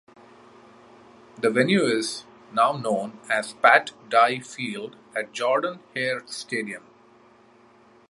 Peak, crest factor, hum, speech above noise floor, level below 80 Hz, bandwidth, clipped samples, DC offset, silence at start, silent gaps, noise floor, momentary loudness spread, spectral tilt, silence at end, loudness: -2 dBFS; 24 dB; none; 31 dB; -74 dBFS; 11.5 kHz; under 0.1%; under 0.1%; 1.4 s; none; -55 dBFS; 12 LU; -4 dB/octave; 1.3 s; -24 LUFS